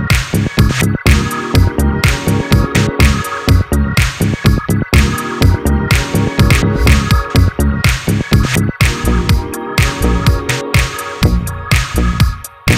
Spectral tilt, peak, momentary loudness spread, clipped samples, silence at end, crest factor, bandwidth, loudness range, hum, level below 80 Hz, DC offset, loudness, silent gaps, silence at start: -5 dB/octave; 0 dBFS; 4 LU; 0.2%; 0 s; 12 dB; 16.5 kHz; 2 LU; none; -18 dBFS; under 0.1%; -13 LUFS; none; 0 s